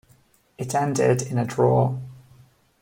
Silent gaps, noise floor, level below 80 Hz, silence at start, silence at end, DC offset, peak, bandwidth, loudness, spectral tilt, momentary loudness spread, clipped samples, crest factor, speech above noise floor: none; -59 dBFS; -60 dBFS; 0.6 s; 0.65 s; under 0.1%; -6 dBFS; 16.5 kHz; -22 LUFS; -6.5 dB/octave; 15 LU; under 0.1%; 18 dB; 38 dB